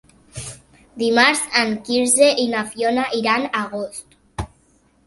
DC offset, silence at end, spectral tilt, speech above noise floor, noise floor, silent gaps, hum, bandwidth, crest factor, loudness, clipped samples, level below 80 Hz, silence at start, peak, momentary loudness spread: under 0.1%; 0.6 s; -2.5 dB/octave; 39 dB; -58 dBFS; none; none; 12 kHz; 20 dB; -18 LUFS; under 0.1%; -48 dBFS; 0.35 s; 0 dBFS; 21 LU